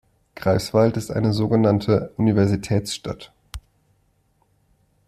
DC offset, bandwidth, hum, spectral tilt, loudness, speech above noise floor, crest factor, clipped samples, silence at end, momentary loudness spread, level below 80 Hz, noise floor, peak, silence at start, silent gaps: under 0.1%; 14 kHz; none; -7 dB/octave; -21 LUFS; 44 dB; 18 dB; under 0.1%; 1.5 s; 20 LU; -48 dBFS; -64 dBFS; -4 dBFS; 0.35 s; none